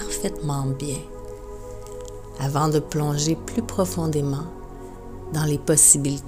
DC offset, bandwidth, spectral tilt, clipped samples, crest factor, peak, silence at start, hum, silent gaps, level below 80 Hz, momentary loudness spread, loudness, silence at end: under 0.1%; 16.5 kHz; -4.5 dB/octave; under 0.1%; 22 dB; -2 dBFS; 0 s; none; none; -40 dBFS; 24 LU; -21 LUFS; 0 s